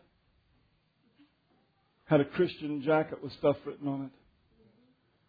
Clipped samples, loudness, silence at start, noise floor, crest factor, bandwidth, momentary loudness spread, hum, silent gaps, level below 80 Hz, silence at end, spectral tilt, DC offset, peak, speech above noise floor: under 0.1%; -31 LUFS; 2.1 s; -71 dBFS; 20 dB; 5 kHz; 10 LU; none; none; -70 dBFS; 1.2 s; -6 dB/octave; under 0.1%; -14 dBFS; 41 dB